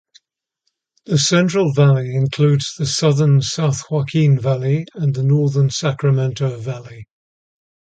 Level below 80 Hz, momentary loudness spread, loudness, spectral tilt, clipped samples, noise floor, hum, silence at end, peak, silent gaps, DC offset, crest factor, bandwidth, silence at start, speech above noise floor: -54 dBFS; 7 LU; -17 LUFS; -6 dB/octave; under 0.1%; -73 dBFS; none; 0.9 s; -2 dBFS; none; under 0.1%; 16 dB; 9 kHz; 1.1 s; 57 dB